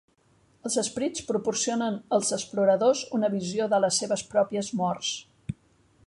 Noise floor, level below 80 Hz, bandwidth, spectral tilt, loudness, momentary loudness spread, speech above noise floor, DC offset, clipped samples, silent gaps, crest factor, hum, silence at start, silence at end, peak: -64 dBFS; -62 dBFS; 11.5 kHz; -3.5 dB/octave; -26 LUFS; 12 LU; 38 dB; under 0.1%; under 0.1%; none; 18 dB; none; 0.65 s; 0.55 s; -10 dBFS